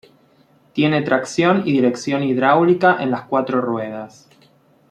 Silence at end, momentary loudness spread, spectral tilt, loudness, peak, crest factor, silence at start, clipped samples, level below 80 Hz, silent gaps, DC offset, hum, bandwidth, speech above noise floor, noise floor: 0.85 s; 12 LU; -6 dB/octave; -18 LUFS; -2 dBFS; 16 dB; 0.75 s; under 0.1%; -62 dBFS; none; under 0.1%; none; 10 kHz; 37 dB; -55 dBFS